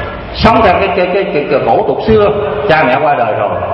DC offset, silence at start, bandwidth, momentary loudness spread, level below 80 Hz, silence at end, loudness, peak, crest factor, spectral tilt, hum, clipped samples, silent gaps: under 0.1%; 0 s; 7 kHz; 5 LU; -30 dBFS; 0 s; -10 LUFS; 0 dBFS; 10 dB; -7.5 dB/octave; none; 0.3%; none